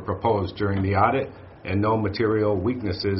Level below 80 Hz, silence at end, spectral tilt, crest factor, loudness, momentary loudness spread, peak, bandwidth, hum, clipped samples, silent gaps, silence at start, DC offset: -50 dBFS; 0 s; -6 dB/octave; 18 dB; -23 LUFS; 7 LU; -4 dBFS; 5.8 kHz; none; under 0.1%; none; 0 s; under 0.1%